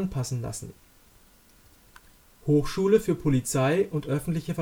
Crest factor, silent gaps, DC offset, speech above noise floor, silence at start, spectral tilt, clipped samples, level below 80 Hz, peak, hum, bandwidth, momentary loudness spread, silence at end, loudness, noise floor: 18 dB; none; under 0.1%; 31 dB; 0 s; -6.5 dB/octave; under 0.1%; -48 dBFS; -8 dBFS; none; over 20 kHz; 13 LU; 0 s; -26 LUFS; -57 dBFS